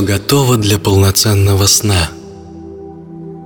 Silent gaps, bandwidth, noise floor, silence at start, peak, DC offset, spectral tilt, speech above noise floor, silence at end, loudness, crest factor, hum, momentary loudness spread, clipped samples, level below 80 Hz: none; 19 kHz; -31 dBFS; 0 s; 0 dBFS; under 0.1%; -4 dB/octave; 20 dB; 0 s; -11 LUFS; 12 dB; none; 22 LU; under 0.1%; -34 dBFS